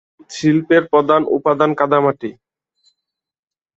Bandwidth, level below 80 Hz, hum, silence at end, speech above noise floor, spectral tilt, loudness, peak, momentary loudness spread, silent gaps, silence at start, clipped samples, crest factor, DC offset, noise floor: 8 kHz; -60 dBFS; none; 1.45 s; 65 dB; -6.5 dB/octave; -15 LUFS; -2 dBFS; 13 LU; none; 0.3 s; under 0.1%; 16 dB; under 0.1%; -80 dBFS